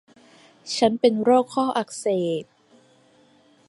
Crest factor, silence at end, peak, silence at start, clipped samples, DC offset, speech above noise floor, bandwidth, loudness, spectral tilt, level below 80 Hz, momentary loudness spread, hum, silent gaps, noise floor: 20 dB; 1.25 s; -6 dBFS; 0.65 s; under 0.1%; under 0.1%; 36 dB; 11.5 kHz; -22 LUFS; -5 dB/octave; -68 dBFS; 11 LU; none; none; -57 dBFS